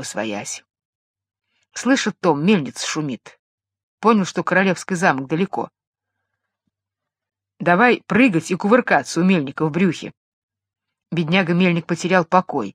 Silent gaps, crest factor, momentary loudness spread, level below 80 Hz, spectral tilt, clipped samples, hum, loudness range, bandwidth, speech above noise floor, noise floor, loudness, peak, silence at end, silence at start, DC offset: 0.85-1.14 s, 3.39-3.58 s, 3.83-3.98 s, 5.87-5.93 s, 10.17-10.48 s; 20 dB; 13 LU; -66 dBFS; -5.5 dB/octave; under 0.1%; none; 5 LU; 12.5 kHz; 66 dB; -85 dBFS; -19 LUFS; 0 dBFS; 0.05 s; 0 s; under 0.1%